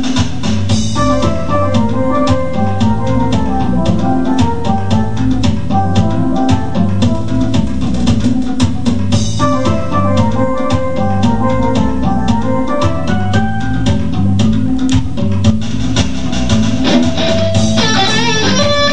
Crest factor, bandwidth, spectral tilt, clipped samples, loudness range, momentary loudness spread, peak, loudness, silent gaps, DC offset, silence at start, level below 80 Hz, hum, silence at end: 14 dB; 9.8 kHz; -6 dB/octave; under 0.1%; 1 LU; 4 LU; 0 dBFS; -14 LUFS; none; 20%; 0 s; -26 dBFS; none; 0 s